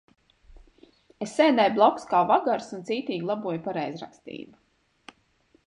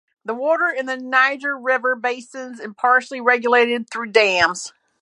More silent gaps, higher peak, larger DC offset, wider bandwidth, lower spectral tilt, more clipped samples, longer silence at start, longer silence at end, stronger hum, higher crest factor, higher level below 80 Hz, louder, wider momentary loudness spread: neither; second, -6 dBFS vs 0 dBFS; neither; about the same, 11 kHz vs 11 kHz; first, -5.5 dB/octave vs -2.5 dB/octave; neither; first, 1.2 s vs 0.25 s; first, 1.2 s vs 0.35 s; neither; about the same, 22 dB vs 20 dB; about the same, -64 dBFS vs -64 dBFS; second, -24 LUFS vs -18 LUFS; first, 20 LU vs 14 LU